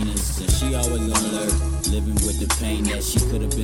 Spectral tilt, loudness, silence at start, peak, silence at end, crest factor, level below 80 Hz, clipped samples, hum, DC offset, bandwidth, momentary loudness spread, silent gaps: -4 dB/octave; -22 LUFS; 0 s; -6 dBFS; 0 s; 16 dB; -24 dBFS; under 0.1%; none; under 0.1%; 17 kHz; 2 LU; none